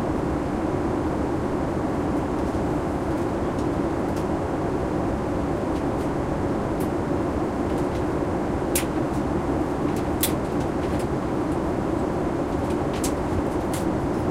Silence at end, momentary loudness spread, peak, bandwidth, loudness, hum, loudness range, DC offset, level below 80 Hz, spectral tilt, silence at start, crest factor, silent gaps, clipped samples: 0 s; 2 LU; -6 dBFS; 16 kHz; -25 LUFS; none; 1 LU; under 0.1%; -36 dBFS; -6.5 dB/octave; 0 s; 18 dB; none; under 0.1%